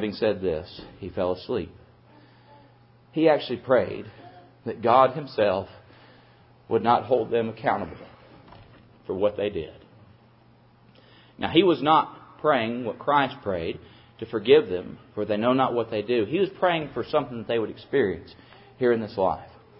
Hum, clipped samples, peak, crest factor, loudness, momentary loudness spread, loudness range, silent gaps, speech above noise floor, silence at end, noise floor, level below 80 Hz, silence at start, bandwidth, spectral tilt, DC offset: none; under 0.1%; -4 dBFS; 22 dB; -25 LUFS; 17 LU; 6 LU; none; 32 dB; 0.3 s; -56 dBFS; -56 dBFS; 0 s; 5.8 kHz; -10 dB/octave; under 0.1%